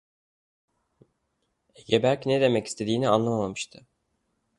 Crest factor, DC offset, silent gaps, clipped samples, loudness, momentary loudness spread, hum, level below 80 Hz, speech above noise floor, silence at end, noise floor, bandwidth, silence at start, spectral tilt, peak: 22 dB; under 0.1%; none; under 0.1%; -25 LUFS; 9 LU; none; -64 dBFS; 51 dB; 0.95 s; -76 dBFS; 11.5 kHz; 1.9 s; -5.5 dB/octave; -6 dBFS